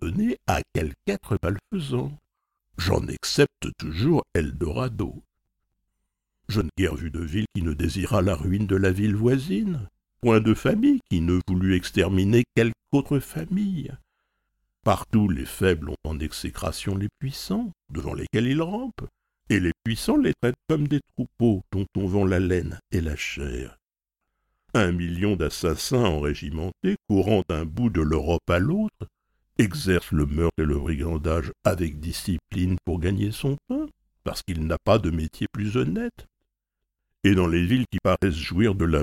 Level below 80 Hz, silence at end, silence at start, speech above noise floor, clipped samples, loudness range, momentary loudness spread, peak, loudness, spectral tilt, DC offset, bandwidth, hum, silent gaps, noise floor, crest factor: -38 dBFS; 0 s; 0 s; 61 dB; under 0.1%; 5 LU; 10 LU; -4 dBFS; -25 LUFS; -6.5 dB/octave; under 0.1%; 16.5 kHz; none; none; -85 dBFS; 20 dB